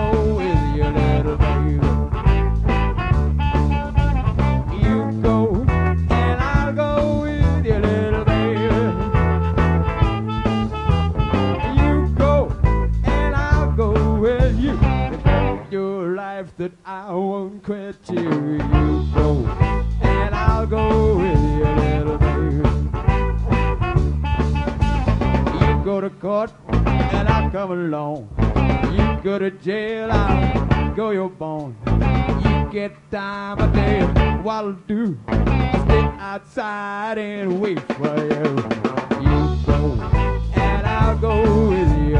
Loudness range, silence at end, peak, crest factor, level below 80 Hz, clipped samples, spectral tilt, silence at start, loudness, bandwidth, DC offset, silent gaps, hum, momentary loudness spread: 3 LU; 0 s; -2 dBFS; 16 dB; -24 dBFS; under 0.1%; -8.5 dB/octave; 0 s; -20 LUFS; 8.2 kHz; under 0.1%; none; none; 7 LU